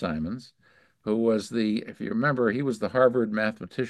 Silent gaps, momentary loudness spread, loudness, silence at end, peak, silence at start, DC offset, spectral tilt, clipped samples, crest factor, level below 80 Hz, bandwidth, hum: none; 10 LU; -26 LUFS; 0 s; -6 dBFS; 0 s; under 0.1%; -6.5 dB/octave; under 0.1%; 20 dB; -56 dBFS; 12 kHz; none